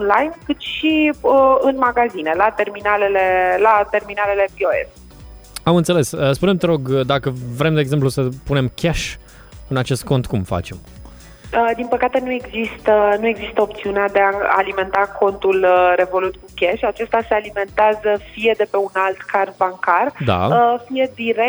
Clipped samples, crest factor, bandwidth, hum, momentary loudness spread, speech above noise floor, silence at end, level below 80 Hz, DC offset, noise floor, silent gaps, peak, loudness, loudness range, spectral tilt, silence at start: under 0.1%; 18 dB; over 20 kHz; none; 8 LU; 22 dB; 0 s; -42 dBFS; under 0.1%; -39 dBFS; none; 0 dBFS; -17 LUFS; 5 LU; -6 dB/octave; 0 s